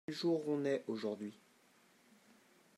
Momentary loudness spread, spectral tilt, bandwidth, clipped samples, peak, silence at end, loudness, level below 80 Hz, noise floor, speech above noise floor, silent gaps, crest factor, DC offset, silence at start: 10 LU; -6 dB/octave; 13.5 kHz; under 0.1%; -24 dBFS; 1.45 s; -39 LUFS; under -90 dBFS; -69 dBFS; 31 dB; none; 16 dB; under 0.1%; 0.1 s